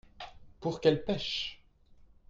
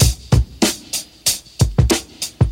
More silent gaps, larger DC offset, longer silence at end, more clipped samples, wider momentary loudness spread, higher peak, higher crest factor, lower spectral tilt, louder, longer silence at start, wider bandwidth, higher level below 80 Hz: neither; neither; first, 0.35 s vs 0 s; neither; first, 20 LU vs 8 LU; second, -12 dBFS vs 0 dBFS; first, 22 dB vs 16 dB; first, -5.5 dB/octave vs -4 dB/octave; second, -32 LUFS vs -18 LUFS; first, 0.2 s vs 0 s; second, 7.6 kHz vs 18 kHz; second, -58 dBFS vs -24 dBFS